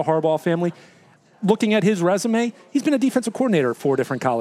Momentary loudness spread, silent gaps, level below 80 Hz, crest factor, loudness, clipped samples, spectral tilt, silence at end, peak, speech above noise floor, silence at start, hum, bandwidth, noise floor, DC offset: 5 LU; none; -74 dBFS; 16 dB; -21 LUFS; under 0.1%; -6 dB/octave; 0 s; -4 dBFS; 31 dB; 0 s; none; 15 kHz; -50 dBFS; under 0.1%